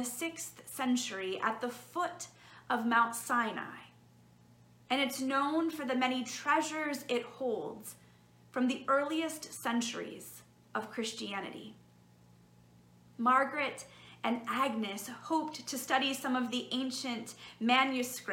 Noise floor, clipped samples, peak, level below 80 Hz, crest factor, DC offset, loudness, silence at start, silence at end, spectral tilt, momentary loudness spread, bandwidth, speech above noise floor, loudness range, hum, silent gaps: -62 dBFS; under 0.1%; -14 dBFS; -78 dBFS; 22 dB; under 0.1%; -34 LUFS; 0 s; 0 s; -2.5 dB/octave; 15 LU; 17 kHz; 28 dB; 3 LU; none; none